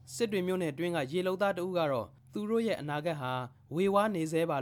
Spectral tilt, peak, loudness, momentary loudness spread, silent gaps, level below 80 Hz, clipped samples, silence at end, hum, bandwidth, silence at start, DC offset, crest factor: -6 dB/octave; -14 dBFS; -32 LUFS; 7 LU; none; -70 dBFS; under 0.1%; 0 s; none; 18.5 kHz; 0.05 s; under 0.1%; 18 dB